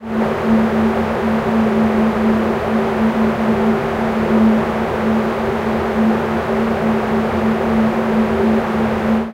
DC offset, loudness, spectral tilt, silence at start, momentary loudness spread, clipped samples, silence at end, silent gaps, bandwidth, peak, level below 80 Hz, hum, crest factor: under 0.1%; -16 LUFS; -7.5 dB/octave; 0 s; 3 LU; under 0.1%; 0 s; none; 11.5 kHz; -2 dBFS; -38 dBFS; none; 14 dB